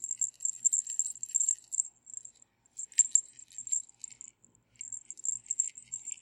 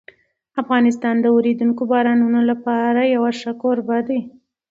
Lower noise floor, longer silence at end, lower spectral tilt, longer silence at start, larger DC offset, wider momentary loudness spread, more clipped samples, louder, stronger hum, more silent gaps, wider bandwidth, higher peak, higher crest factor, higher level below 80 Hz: first, -66 dBFS vs -49 dBFS; second, 0.05 s vs 0.4 s; second, 3 dB/octave vs -6.5 dB/octave; second, 0 s vs 0.55 s; neither; first, 19 LU vs 7 LU; neither; second, -30 LUFS vs -18 LUFS; first, 60 Hz at -80 dBFS vs none; neither; first, 16.5 kHz vs 7.6 kHz; second, -8 dBFS vs -2 dBFS; first, 26 dB vs 16 dB; second, -84 dBFS vs -68 dBFS